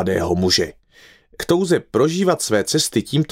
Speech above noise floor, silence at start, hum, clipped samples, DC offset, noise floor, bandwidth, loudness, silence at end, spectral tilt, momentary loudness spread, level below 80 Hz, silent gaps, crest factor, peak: 32 dB; 0 s; none; under 0.1%; under 0.1%; -50 dBFS; 16 kHz; -18 LUFS; 0.05 s; -4.5 dB/octave; 4 LU; -50 dBFS; none; 16 dB; -4 dBFS